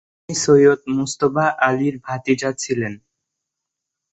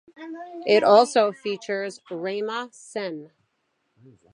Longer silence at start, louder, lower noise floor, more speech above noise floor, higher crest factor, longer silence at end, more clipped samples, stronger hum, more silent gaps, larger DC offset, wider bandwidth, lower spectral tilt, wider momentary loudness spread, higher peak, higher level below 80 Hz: about the same, 0.3 s vs 0.2 s; first, -18 LUFS vs -23 LUFS; first, -82 dBFS vs -73 dBFS; first, 64 dB vs 50 dB; about the same, 18 dB vs 22 dB; about the same, 1.15 s vs 1.05 s; neither; neither; neither; neither; second, 8.2 kHz vs 11 kHz; about the same, -5 dB/octave vs -4 dB/octave; second, 12 LU vs 21 LU; about the same, -2 dBFS vs -4 dBFS; first, -58 dBFS vs -80 dBFS